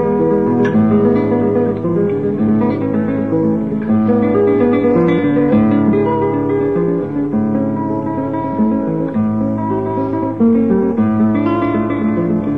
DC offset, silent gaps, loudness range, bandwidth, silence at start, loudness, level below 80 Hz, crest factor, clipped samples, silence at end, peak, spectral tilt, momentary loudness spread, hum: 0.7%; none; 3 LU; 4.1 kHz; 0 s; -15 LUFS; -44 dBFS; 12 dB; under 0.1%; 0 s; -2 dBFS; -10.5 dB/octave; 5 LU; none